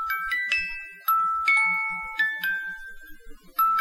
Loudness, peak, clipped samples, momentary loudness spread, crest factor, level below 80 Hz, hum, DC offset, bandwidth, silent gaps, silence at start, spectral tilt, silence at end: -24 LUFS; -8 dBFS; under 0.1%; 13 LU; 18 dB; -52 dBFS; none; under 0.1%; 16.5 kHz; none; 0 s; -0.5 dB/octave; 0 s